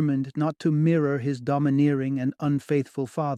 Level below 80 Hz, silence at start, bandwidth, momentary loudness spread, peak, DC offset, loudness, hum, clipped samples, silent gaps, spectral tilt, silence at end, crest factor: -66 dBFS; 0 s; 10.5 kHz; 6 LU; -12 dBFS; under 0.1%; -25 LUFS; none; under 0.1%; none; -8.5 dB/octave; 0 s; 12 dB